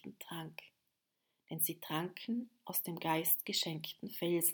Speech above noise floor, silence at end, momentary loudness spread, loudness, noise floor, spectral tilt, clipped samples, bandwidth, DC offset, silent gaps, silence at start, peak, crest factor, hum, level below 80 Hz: 47 dB; 0 s; 15 LU; -37 LUFS; -85 dBFS; -3 dB/octave; under 0.1%; over 20 kHz; under 0.1%; none; 0.05 s; -16 dBFS; 24 dB; none; -88 dBFS